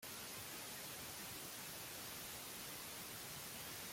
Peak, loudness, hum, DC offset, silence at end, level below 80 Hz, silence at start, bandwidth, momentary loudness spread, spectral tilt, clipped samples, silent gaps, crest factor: -36 dBFS; -48 LUFS; none; under 0.1%; 0 s; -74 dBFS; 0 s; 16.5 kHz; 0 LU; -1.5 dB/octave; under 0.1%; none; 16 dB